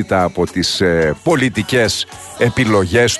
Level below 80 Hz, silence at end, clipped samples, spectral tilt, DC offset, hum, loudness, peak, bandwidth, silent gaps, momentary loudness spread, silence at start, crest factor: -40 dBFS; 0 s; under 0.1%; -4.5 dB/octave; under 0.1%; none; -15 LUFS; -2 dBFS; 12.5 kHz; none; 4 LU; 0 s; 14 dB